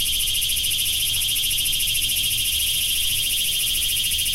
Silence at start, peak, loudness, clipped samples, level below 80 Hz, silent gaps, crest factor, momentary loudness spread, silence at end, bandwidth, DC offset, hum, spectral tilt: 0 s; -8 dBFS; -19 LUFS; under 0.1%; -38 dBFS; none; 14 dB; 0 LU; 0 s; 16.5 kHz; under 0.1%; none; 1.5 dB/octave